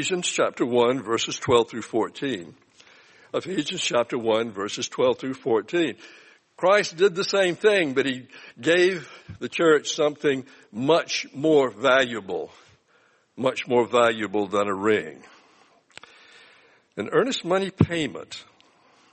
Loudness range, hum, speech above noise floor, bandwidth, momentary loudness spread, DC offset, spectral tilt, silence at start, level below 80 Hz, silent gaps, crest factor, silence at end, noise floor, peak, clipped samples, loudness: 5 LU; none; 38 dB; 8.8 kHz; 13 LU; under 0.1%; -4 dB/octave; 0 s; -64 dBFS; none; 22 dB; 0.7 s; -62 dBFS; -2 dBFS; under 0.1%; -23 LUFS